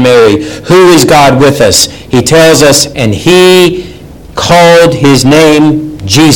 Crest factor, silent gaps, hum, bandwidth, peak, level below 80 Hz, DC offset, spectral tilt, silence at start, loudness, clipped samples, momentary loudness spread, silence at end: 4 dB; none; none; over 20 kHz; 0 dBFS; -32 dBFS; 1%; -4.5 dB/octave; 0 s; -4 LUFS; 9%; 7 LU; 0 s